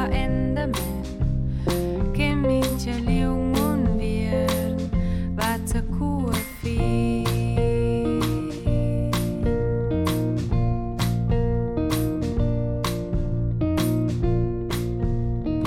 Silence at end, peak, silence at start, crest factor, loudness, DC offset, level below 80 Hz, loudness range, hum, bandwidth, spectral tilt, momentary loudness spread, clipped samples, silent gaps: 0 s; -8 dBFS; 0 s; 14 dB; -24 LUFS; under 0.1%; -30 dBFS; 1 LU; none; 17 kHz; -6.5 dB/octave; 4 LU; under 0.1%; none